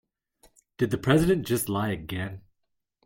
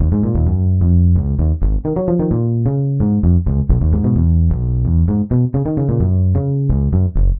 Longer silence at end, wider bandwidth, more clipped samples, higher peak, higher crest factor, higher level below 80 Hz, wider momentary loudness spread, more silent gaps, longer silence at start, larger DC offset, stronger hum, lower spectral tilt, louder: first, 0.65 s vs 0 s; first, 17 kHz vs 1.9 kHz; neither; second, -8 dBFS vs -2 dBFS; first, 20 dB vs 12 dB; second, -50 dBFS vs -20 dBFS; first, 13 LU vs 3 LU; neither; first, 0.8 s vs 0 s; neither; neither; second, -6 dB/octave vs -16.5 dB/octave; second, -26 LUFS vs -16 LUFS